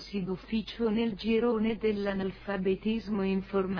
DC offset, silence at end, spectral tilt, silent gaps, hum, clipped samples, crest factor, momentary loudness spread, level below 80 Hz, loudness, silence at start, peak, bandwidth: under 0.1%; 0 s; -8 dB/octave; none; none; under 0.1%; 12 dB; 6 LU; -52 dBFS; -31 LUFS; 0 s; -18 dBFS; 5.4 kHz